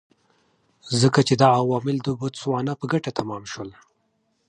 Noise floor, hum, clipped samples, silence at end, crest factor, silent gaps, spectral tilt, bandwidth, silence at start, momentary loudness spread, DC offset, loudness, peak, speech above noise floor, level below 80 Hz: -70 dBFS; none; under 0.1%; 0.75 s; 20 dB; none; -5.5 dB/octave; 11 kHz; 0.85 s; 15 LU; under 0.1%; -22 LUFS; -4 dBFS; 48 dB; -60 dBFS